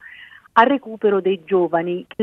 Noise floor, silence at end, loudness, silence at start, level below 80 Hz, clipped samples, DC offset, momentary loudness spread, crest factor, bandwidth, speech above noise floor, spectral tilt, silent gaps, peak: -43 dBFS; 0 s; -19 LUFS; 0.05 s; -68 dBFS; under 0.1%; under 0.1%; 6 LU; 18 dB; 5.8 kHz; 25 dB; -8 dB/octave; none; 0 dBFS